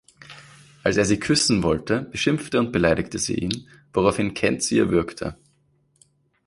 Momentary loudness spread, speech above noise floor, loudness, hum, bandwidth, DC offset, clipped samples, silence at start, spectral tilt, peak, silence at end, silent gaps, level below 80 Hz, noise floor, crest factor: 11 LU; 42 dB; -22 LUFS; none; 11.5 kHz; under 0.1%; under 0.1%; 0.3 s; -4.5 dB/octave; -4 dBFS; 1.15 s; none; -46 dBFS; -64 dBFS; 20 dB